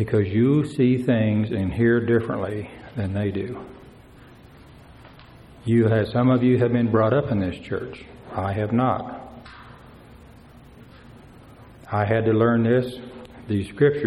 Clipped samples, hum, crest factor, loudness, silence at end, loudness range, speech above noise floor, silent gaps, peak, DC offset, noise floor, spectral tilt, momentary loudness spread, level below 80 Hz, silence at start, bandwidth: under 0.1%; none; 18 dB; -22 LUFS; 0 s; 9 LU; 26 dB; none; -6 dBFS; under 0.1%; -47 dBFS; -9 dB/octave; 18 LU; -50 dBFS; 0 s; 11.5 kHz